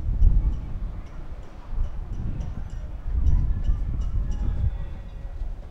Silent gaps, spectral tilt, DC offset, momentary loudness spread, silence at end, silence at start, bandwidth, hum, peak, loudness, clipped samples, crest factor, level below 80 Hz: none; -8.5 dB/octave; under 0.1%; 15 LU; 0 s; 0 s; 6 kHz; none; -6 dBFS; -30 LUFS; under 0.1%; 18 dB; -26 dBFS